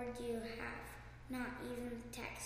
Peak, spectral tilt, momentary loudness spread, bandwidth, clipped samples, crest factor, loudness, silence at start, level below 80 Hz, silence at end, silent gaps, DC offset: -30 dBFS; -4.5 dB/octave; 7 LU; 15.5 kHz; under 0.1%; 16 dB; -46 LUFS; 0 s; -58 dBFS; 0 s; none; under 0.1%